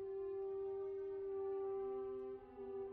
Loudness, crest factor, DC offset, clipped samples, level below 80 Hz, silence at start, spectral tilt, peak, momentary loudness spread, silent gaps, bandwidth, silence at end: -45 LUFS; 8 dB; under 0.1%; under 0.1%; -74 dBFS; 0 s; -7 dB/octave; -36 dBFS; 6 LU; none; 3.3 kHz; 0 s